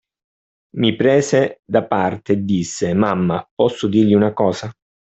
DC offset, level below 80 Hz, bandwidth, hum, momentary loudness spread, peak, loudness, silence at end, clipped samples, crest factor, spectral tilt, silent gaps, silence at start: under 0.1%; -56 dBFS; 8.2 kHz; none; 6 LU; -2 dBFS; -17 LUFS; 0.35 s; under 0.1%; 16 dB; -6 dB/octave; 1.59-1.63 s, 3.51-3.57 s; 0.75 s